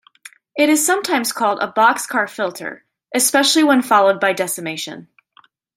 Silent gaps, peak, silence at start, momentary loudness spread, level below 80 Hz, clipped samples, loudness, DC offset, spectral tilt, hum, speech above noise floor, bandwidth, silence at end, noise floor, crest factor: none; 0 dBFS; 0.55 s; 15 LU; -72 dBFS; under 0.1%; -16 LUFS; under 0.1%; -2 dB/octave; none; 37 dB; 16.5 kHz; 0.75 s; -54 dBFS; 18 dB